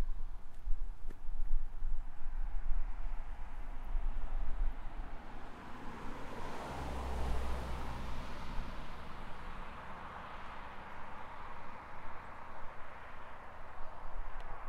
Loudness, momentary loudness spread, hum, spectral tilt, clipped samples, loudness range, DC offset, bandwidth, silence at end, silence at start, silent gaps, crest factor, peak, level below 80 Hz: -47 LUFS; 8 LU; none; -6 dB/octave; under 0.1%; 6 LU; under 0.1%; 5.2 kHz; 0 s; 0 s; none; 16 dB; -18 dBFS; -38 dBFS